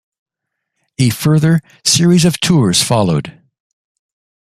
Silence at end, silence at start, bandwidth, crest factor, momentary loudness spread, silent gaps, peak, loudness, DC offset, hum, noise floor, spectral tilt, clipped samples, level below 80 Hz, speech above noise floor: 1.15 s; 1 s; 15 kHz; 14 dB; 6 LU; none; 0 dBFS; -12 LUFS; under 0.1%; none; -77 dBFS; -4.5 dB/octave; under 0.1%; -48 dBFS; 65 dB